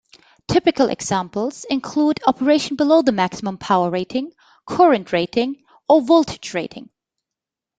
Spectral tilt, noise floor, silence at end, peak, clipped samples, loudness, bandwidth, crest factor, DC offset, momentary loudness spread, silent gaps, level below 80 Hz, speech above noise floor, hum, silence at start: -5 dB/octave; -86 dBFS; 0.95 s; -2 dBFS; under 0.1%; -19 LUFS; 9.2 kHz; 18 dB; under 0.1%; 12 LU; none; -54 dBFS; 68 dB; none; 0.5 s